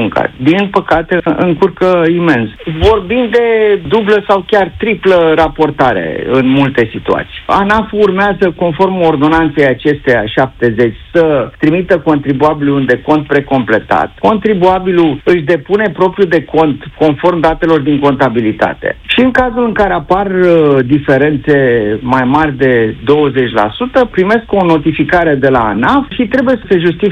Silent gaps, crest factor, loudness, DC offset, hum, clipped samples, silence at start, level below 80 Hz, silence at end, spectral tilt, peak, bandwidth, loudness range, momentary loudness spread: none; 10 dB; -10 LUFS; under 0.1%; none; 0.2%; 0 s; -34 dBFS; 0 s; -8 dB/octave; 0 dBFS; 9.2 kHz; 1 LU; 3 LU